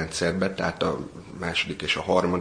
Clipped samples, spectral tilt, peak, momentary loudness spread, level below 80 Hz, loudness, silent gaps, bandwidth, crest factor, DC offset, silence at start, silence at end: under 0.1%; -4.5 dB/octave; -6 dBFS; 11 LU; -50 dBFS; -26 LUFS; none; 10.5 kHz; 20 dB; under 0.1%; 0 s; 0 s